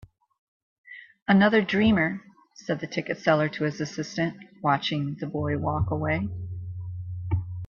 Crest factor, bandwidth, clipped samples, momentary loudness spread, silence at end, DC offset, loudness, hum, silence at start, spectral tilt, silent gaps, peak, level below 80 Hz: 20 dB; 7.2 kHz; under 0.1%; 15 LU; 0 s; under 0.1%; -26 LUFS; none; 0.9 s; -6.5 dB/octave; 1.22-1.26 s; -6 dBFS; -50 dBFS